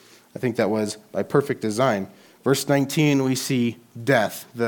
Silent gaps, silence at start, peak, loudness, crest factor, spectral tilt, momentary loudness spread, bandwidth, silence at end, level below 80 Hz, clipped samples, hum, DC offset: none; 0.35 s; -4 dBFS; -23 LUFS; 18 dB; -5.5 dB/octave; 9 LU; 19 kHz; 0 s; -68 dBFS; under 0.1%; none; under 0.1%